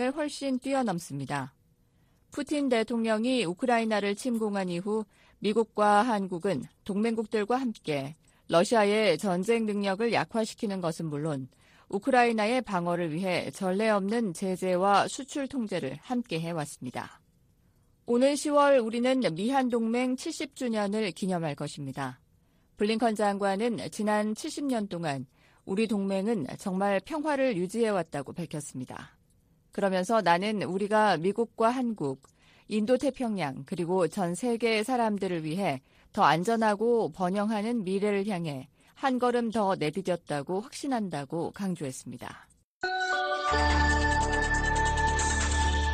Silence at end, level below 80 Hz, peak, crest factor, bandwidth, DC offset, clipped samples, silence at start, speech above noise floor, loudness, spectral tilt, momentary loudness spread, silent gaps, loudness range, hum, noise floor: 0 s; -44 dBFS; -10 dBFS; 20 dB; 15 kHz; under 0.1%; under 0.1%; 0 s; 37 dB; -29 LUFS; -5 dB/octave; 12 LU; 42.64-42.81 s; 4 LU; none; -66 dBFS